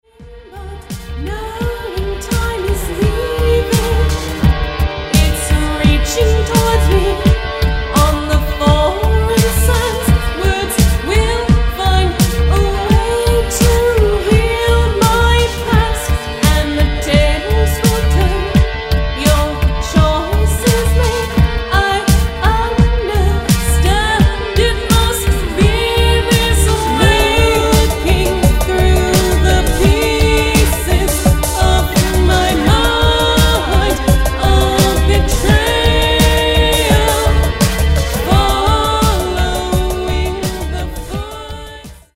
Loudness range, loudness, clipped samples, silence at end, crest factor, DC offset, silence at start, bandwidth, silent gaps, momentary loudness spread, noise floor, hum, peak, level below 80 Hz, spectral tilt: 3 LU; -13 LUFS; under 0.1%; 0.2 s; 12 dB; under 0.1%; 0.2 s; 16.5 kHz; none; 6 LU; -36 dBFS; none; 0 dBFS; -16 dBFS; -5 dB/octave